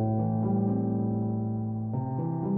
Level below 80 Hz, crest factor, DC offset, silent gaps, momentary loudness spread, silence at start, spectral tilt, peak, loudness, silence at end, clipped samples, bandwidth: -58 dBFS; 10 dB; under 0.1%; none; 5 LU; 0 s; -15 dB/octave; -18 dBFS; -29 LUFS; 0 s; under 0.1%; 2 kHz